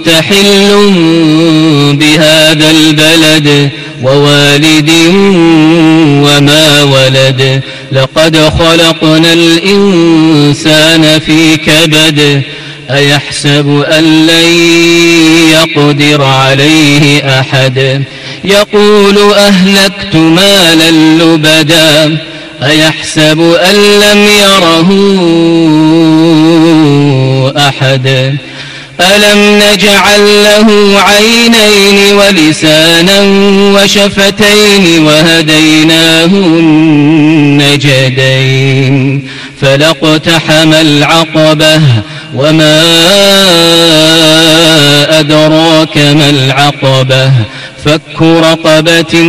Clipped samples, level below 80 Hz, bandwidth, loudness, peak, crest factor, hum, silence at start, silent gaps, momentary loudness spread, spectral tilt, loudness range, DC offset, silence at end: 4%; -36 dBFS; 16 kHz; -4 LUFS; 0 dBFS; 4 dB; none; 0 s; none; 6 LU; -4.5 dB/octave; 3 LU; under 0.1%; 0 s